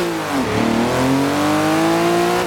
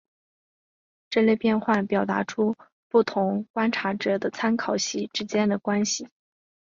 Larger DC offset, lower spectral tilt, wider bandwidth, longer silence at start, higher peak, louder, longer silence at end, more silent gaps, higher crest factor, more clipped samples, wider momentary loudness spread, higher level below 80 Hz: neither; about the same, -5 dB/octave vs -4.5 dB/octave; first, 18.5 kHz vs 7.6 kHz; second, 0 s vs 1.1 s; about the same, -6 dBFS vs -8 dBFS; first, -17 LUFS vs -25 LUFS; second, 0 s vs 0.6 s; second, none vs 2.72-2.90 s, 3.50-3.54 s; second, 12 dB vs 18 dB; neither; about the same, 4 LU vs 5 LU; first, -44 dBFS vs -68 dBFS